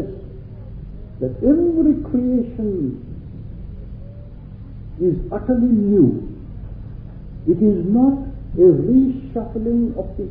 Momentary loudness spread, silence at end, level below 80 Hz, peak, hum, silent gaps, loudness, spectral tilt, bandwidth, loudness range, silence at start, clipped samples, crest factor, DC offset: 21 LU; 0 s; -34 dBFS; -2 dBFS; none; none; -18 LUFS; -14 dB/octave; 2.9 kHz; 7 LU; 0 s; under 0.1%; 16 dB; under 0.1%